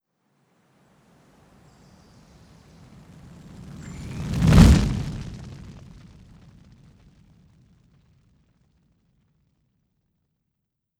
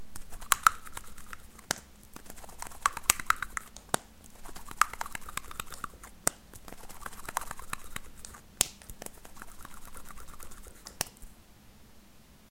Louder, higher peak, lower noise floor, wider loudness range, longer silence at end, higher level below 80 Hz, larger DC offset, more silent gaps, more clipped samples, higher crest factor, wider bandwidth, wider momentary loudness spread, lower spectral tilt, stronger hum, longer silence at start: first, -19 LUFS vs -32 LUFS; about the same, 0 dBFS vs 0 dBFS; first, -80 dBFS vs -56 dBFS; first, 19 LU vs 7 LU; first, 5.25 s vs 0.05 s; first, -32 dBFS vs -50 dBFS; neither; neither; neither; second, 26 dB vs 36 dB; second, 15 kHz vs 17 kHz; first, 31 LU vs 22 LU; first, -6.5 dB/octave vs -0.5 dB/octave; neither; first, 3.8 s vs 0 s